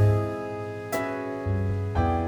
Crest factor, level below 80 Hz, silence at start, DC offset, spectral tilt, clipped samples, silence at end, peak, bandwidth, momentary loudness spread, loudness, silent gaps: 14 dB; -40 dBFS; 0 s; under 0.1%; -7.5 dB/octave; under 0.1%; 0 s; -12 dBFS; 19.5 kHz; 7 LU; -28 LUFS; none